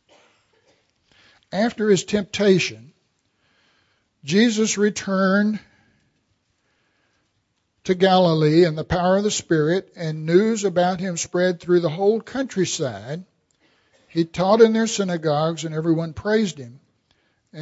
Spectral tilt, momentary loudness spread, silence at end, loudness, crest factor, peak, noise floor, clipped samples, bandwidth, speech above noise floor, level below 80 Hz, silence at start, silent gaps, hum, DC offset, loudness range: -5 dB/octave; 12 LU; 0 s; -20 LUFS; 20 dB; -2 dBFS; -71 dBFS; under 0.1%; 8 kHz; 51 dB; -54 dBFS; 1.55 s; none; none; under 0.1%; 4 LU